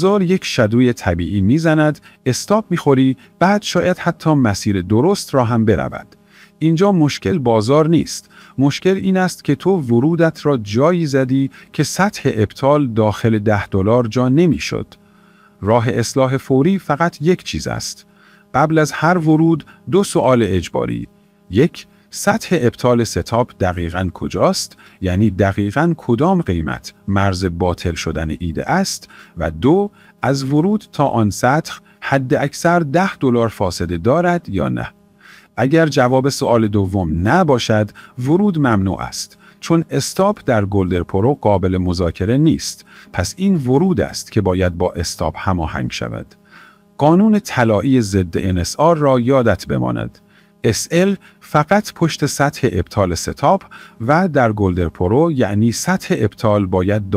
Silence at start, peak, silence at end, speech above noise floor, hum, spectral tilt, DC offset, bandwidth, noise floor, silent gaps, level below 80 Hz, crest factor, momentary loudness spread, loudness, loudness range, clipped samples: 0 s; 0 dBFS; 0 s; 33 dB; none; -6 dB/octave; under 0.1%; 16 kHz; -49 dBFS; none; -44 dBFS; 16 dB; 9 LU; -16 LUFS; 2 LU; under 0.1%